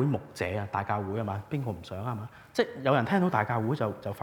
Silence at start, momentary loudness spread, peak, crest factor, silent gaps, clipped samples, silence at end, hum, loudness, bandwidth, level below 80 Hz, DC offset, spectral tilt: 0 s; 10 LU; -10 dBFS; 20 dB; none; under 0.1%; 0 s; none; -30 LUFS; 20 kHz; -64 dBFS; under 0.1%; -7.5 dB/octave